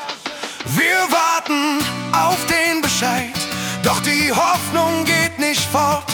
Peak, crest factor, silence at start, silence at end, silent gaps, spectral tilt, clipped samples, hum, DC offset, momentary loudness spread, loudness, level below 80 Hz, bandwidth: -2 dBFS; 16 dB; 0 s; 0 s; none; -3 dB/octave; under 0.1%; none; under 0.1%; 7 LU; -17 LUFS; -52 dBFS; 19 kHz